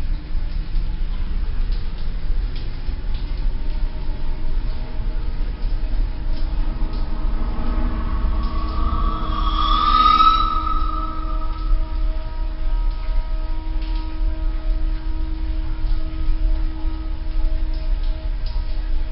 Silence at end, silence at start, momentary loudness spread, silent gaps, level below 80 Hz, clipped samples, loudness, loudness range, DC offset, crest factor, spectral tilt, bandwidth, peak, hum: 0 s; 0 s; 9 LU; none; -20 dBFS; under 0.1%; -25 LUFS; 10 LU; under 0.1%; 16 dB; -10 dB/octave; 5.8 kHz; -2 dBFS; none